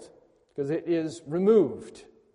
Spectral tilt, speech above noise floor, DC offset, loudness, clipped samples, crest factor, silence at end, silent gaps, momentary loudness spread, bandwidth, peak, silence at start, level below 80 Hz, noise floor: -7.5 dB/octave; 33 dB; under 0.1%; -26 LUFS; under 0.1%; 18 dB; 0.35 s; none; 20 LU; 10.5 kHz; -10 dBFS; 0 s; -70 dBFS; -59 dBFS